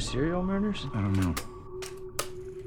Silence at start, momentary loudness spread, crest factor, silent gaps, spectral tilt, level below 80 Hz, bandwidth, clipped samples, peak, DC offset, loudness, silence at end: 0 s; 12 LU; 18 dB; none; -5.5 dB/octave; -44 dBFS; 19 kHz; under 0.1%; -14 dBFS; under 0.1%; -31 LUFS; 0 s